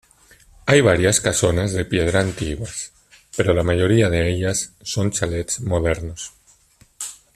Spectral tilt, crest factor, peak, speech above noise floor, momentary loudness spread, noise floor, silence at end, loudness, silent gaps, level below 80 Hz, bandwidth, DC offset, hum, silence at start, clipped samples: -4.5 dB/octave; 18 dB; -2 dBFS; 36 dB; 16 LU; -55 dBFS; 0.2 s; -19 LUFS; none; -40 dBFS; 14 kHz; under 0.1%; none; 0.65 s; under 0.1%